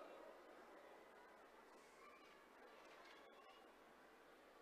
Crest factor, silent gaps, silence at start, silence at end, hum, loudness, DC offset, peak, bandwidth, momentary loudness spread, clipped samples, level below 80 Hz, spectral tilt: 18 dB; none; 0 s; 0 s; none; -65 LUFS; under 0.1%; -46 dBFS; 15 kHz; 4 LU; under 0.1%; under -90 dBFS; -3 dB/octave